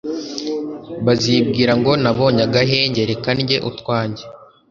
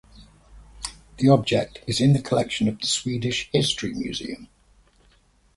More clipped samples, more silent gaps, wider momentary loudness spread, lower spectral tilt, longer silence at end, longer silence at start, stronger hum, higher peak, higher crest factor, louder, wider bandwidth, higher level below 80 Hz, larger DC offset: neither; neither; second, 11 LU vs 16 LU; about the same, -5.5 dB/octave vs -5 dB/octave; second, 0.25 s vs 1.1 s; about the same, 0.05 s vs 0.15 s; neither; about the same, 0 dBFS vs -2 dBFS; about the same, 18 dB vs 22 dB; first, -17 LUFS vs -23 LUFS; second, 7.4 kHz vs 11.5 kHz; about the same, -48 dBFS vs -50 dBFS; neither